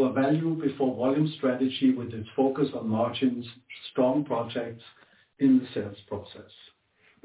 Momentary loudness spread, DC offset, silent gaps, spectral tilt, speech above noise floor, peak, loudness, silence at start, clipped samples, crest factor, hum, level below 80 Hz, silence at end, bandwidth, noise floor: 14 LU; under 0.1%; none; -6 dB/octave; 38 dB; -12 dBFS; -27 LUFS; 0 s; under 0.1%; 14 dB; none; -64 dBFS; 0.8 s; 4 kHz; -64 dBFS